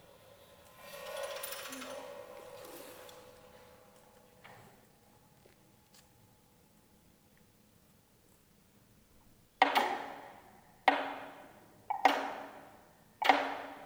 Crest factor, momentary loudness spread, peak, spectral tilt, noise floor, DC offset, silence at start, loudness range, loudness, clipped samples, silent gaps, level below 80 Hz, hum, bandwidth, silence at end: 30 dB; 28 LU; -8 dBFS; -2 dB/octave; -66 dBFS; under 0.1%; 0.3 s; 21 LU; -34 LUFS; under 0.1%; none; -74 dBFS; none; over 20 kHz; 0 s